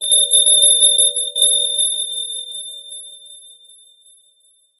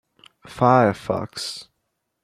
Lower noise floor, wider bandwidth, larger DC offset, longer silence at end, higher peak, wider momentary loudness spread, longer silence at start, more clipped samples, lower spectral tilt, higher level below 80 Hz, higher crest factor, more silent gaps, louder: second, -57 dBFS vs -76 dBFS; about the same, 15 kHz vs 14.5 kHz; neither; first, 1.45 s vs 0.6 s; about the same, 0 dBFS vs -2 dBFS; about the same, 21 LU vs 19 LU; second, 0 s vs 0.45 s; neither; second, 6.5 dB/octave vs -6 dB/octave; second, under -90 dBFS vs -58 dBFS; about the same, 18 dB vs 20 dB; neither; first, -12 LUFS vs -21 LUFS